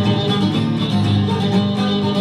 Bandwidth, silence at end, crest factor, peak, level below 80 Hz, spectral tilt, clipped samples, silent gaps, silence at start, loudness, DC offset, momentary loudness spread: 11 kHz; 0 s; 12 dB; -4 dBFS; -50 dBFS; -7 dB/octave; under 0.1%; none; 0 s; -17 LUFS; under 0.1%; 1 LU